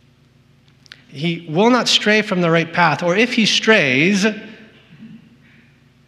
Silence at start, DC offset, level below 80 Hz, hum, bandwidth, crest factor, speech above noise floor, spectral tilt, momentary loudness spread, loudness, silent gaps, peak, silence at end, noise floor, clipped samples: 1.1 s; under 0.1%; -66 dBFS; 60 Hz at -45 dBFS; 13 kHz; 18 dB; 37 dB; -4 dB/octave; 10 LU; -15 LUFS; none; 0 dBFS; 0.9 s; -53 dBFS; under 0.1%